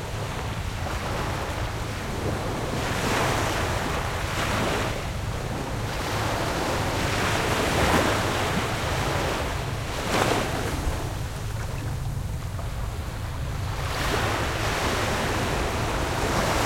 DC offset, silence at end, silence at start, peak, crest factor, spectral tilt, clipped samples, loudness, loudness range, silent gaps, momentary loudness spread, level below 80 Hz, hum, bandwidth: under 0.1%; 0 s; 0 s; -6 dBFS; 20 dB; -4.5 dB/octave; under 0.1%; -27 LUFS; 5 LU; none; 8 LU; -36 dBFS; none; 16.5 kHz